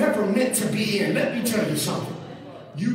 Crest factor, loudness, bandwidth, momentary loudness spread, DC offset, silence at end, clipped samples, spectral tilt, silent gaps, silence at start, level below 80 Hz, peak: 14 dB; -23 LUFS; 16 kHz; 16 LU; under 0.1%; 0 s; under 0.1%; -4.5 dB/octave; none; 0 s; -64 dBFS; -8 dBFS